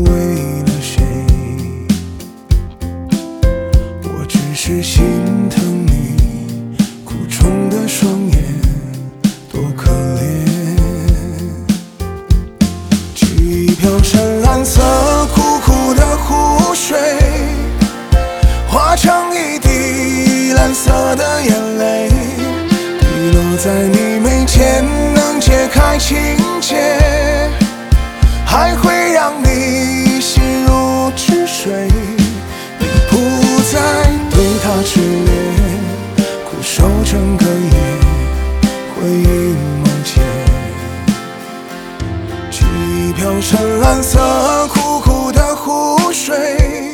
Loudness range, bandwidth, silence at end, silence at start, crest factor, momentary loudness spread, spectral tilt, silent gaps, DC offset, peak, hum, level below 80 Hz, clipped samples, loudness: 5 LU; 18.5 kHz; 0 s; 0 s; 12 dB; 7 LU; -5 dB/octave; none; under 0.1%; 0 dBFS; none; -16 dBFS; under 0.1%; -13 LUFS